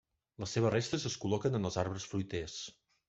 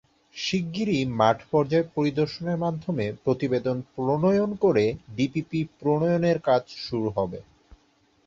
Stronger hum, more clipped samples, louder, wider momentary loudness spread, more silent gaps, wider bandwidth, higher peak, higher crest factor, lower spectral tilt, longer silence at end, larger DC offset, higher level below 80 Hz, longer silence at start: neither; neither; second, -36 LUFS vs -25 LUFS; first, 12 LU vs 8 LU; neither; about the same, 8.2 kHz vs 7.6 kHz; second, -16 dBFS vs -6 dBFS; about the same, 20 dB vs 20 dB; second, -5 dB/octave vs -7 dB/octave; second, 0.35 s vs 0.85 s; neither; second, -64 dBFS vs -56 dBFS; about the same, 0.4 s vs 0.35 s